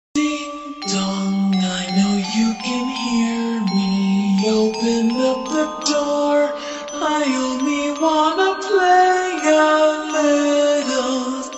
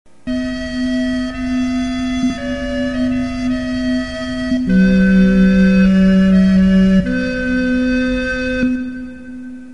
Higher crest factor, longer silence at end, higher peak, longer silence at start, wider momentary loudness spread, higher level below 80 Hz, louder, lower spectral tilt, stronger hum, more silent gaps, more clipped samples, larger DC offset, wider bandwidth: about the same, 14 dB vs 12 dB; about the same, 0 s vs 0 s; about the same, -4 dBFS vs -2 dBFS; about the same, 0.15 s vs 0.25 s; second, 7 LU vs 11 LU; second, -54 dBFS vs -30 dBFS; second, -18 LUFS vs -15 LUFS; second, -4.5 dB/octave vs -7.5 dB/octave; neither; neither; neither; second, under 0.1% vs 1%; about the same, 8.4 kHz vs 8.8 kHz